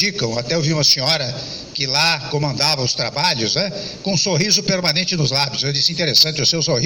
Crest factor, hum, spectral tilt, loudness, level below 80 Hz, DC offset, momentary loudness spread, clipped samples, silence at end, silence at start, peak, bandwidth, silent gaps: 16 dB; none; -3 dB/octave; -16 LUFS; -50 dBFS; under 0.1%; 9 LU; under 0.1%; 0 s; 0 s; -2 dBFS; 18.5 kHz; none